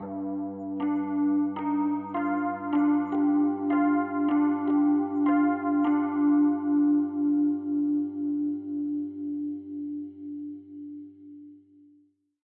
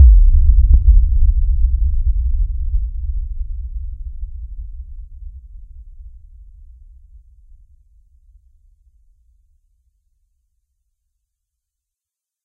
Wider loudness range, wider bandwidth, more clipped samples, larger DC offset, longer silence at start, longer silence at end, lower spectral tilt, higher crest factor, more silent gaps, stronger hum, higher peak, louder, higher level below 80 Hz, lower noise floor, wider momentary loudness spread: second, 11 LU vs 25 LU; first, 3.3 kHz vs 0.5 kHz; neither; neither; about the same, 0 s vs 0 s; second, 0.9 s vs 6.45 s; second, -10 dB/octave vs -13 dB/octave; about the same, 12 dB vs 16 dB; neither; neither; second, -14 dBFS vs 0 dBFS; second, -26 LUFS vs -18 LUFS; second, -82 dBFS vs -16 dBFS; second, -63 dBFS vs -87 dBFS; second, 14 LU vs 24 LU